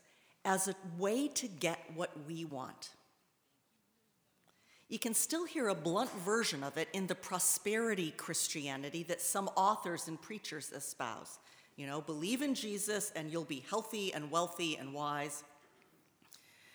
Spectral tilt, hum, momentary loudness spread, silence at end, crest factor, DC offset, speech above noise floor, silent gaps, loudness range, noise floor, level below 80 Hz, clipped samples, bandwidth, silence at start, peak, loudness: -3 dB/octave; none; 11 LU; 0.4 s; 24 dB; under 0.1%; 39 dB; none; 6 LU; -77 dBFS; -90 dBFS; under 0.1%; over 20 kHz; 0.45 s; -14 dBFS; -37 LUFS